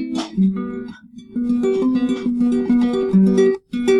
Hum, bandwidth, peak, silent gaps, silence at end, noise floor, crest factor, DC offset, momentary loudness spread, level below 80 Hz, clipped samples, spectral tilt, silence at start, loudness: none; 10 kHz; -6 dBFS; none; 0 s; -37 dBFS; 12 dB; under 0.1%; 13 LU; -50 dBFS; under 0.1%; -7.5 dB/octave; 0 s; -18 LUFS